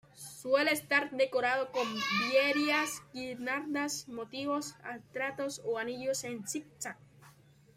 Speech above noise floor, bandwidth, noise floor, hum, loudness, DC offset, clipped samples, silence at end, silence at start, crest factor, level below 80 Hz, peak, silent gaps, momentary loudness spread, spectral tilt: 27 dB; 16 kHz; -60 dBFS; none; -33 LUFS; under 0.1%; under 0.1%; 0.45 s; 0.15 s; 20 dB; -76 dBFS; -14 dBFS; none; 14 LU; -2.5 dB/octave